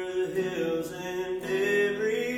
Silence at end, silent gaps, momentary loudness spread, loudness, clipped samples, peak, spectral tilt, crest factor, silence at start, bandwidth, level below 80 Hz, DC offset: 0 s; none; 7 LU; -29 LUFS; under 0.1%; -14 dBFS; -5 dB/octave; 14 dB; 0 s; 17 kHz; -62 dBFS; under 0.1%